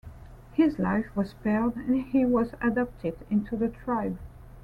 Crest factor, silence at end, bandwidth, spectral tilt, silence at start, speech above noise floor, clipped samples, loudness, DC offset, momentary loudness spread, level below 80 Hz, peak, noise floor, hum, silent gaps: 16 dB; 0 s; 5.4 kHz; -9 dB/octave; 0.05 s; 19 dB; under 0.1%; -28 LUFS; under 0.1%; 10 LU; -48 dBFS; -12 dBFS; -46 dBFS; none; none